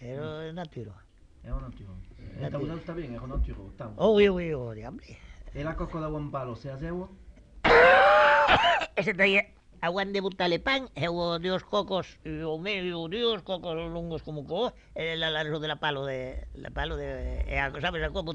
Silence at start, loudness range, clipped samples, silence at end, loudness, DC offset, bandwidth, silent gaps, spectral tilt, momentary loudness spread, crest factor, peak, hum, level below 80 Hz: 0 s; 12 LU; under 0.1%; 0 s; -27 LUFS; under 0.1%; 9.2 kHz; none; -5.5 dB/octave; 20 LU; 20 dB; -8 dBFS; none; -42 dBFS